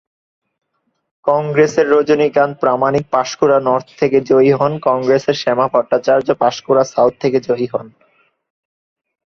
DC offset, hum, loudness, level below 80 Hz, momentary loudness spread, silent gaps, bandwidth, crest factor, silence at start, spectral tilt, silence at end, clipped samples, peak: under 0.1%; none; -14 LUFS; -56 dBFS; 6 LU; none; 7.4 kHz; 14 dB; 1.25 s; -6 dB/octave; 1.4 s; under 0.1%; -2 dBFS